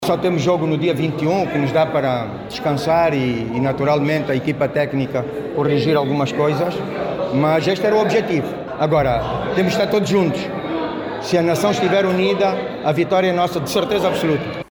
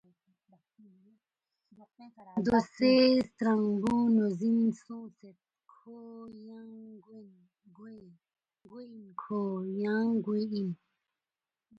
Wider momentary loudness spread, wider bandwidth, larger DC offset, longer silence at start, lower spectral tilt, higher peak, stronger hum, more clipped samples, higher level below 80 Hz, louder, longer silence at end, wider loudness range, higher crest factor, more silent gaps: second, 7 LU vs 25 LU; first, 19.5 kHz vs 8 kHz; neither; second, 0 s vs 2 s; about the same, -6 dB/octave vs -7 dB/octave; first, -6 dBFS vs -12 dBFS; neither; neither; first, -46 dBFS vs -68 dBFS; first, -18 LUFS vs -29 LUFS; second, 0.1 s vs 1.05 s; second, 1 LU vs 23 LU; second, 12 dB vs 20 dB; neither